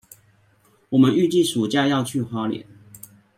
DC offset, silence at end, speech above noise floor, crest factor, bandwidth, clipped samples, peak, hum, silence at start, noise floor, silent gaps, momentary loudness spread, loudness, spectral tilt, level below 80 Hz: under 0.1%; 0.75 s; 40 dB; 18 dB; 16.5 kHz; under 0.1%; -4 dBFS; none; 0.9 s; -59 dBFS; none; 10 LU; -20 LUFS; -5.5 dB/octave; -64 dBFS